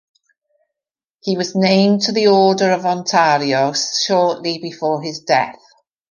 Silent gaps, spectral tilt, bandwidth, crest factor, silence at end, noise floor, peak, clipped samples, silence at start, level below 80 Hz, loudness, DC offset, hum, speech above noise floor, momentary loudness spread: none; -4.5 dB/octave; 10 kHz; 16 dB; 0.6 s; -88 dBFS; -2 dBFS; under 0.1%; 1.25 s; -66 dBFS; -16 LUFS; under 0.1%; none; 72 dB; 10 LU